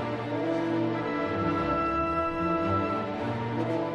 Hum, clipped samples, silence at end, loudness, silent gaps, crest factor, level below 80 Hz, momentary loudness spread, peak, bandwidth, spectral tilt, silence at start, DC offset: none; under 0.1%; 0 s; -28 LUFS; none; 12 dB; -50 dBFS; 4 LU; -16 dBFS; 8.4 kHz; -8 dB/octave; 0 s; under 0.1%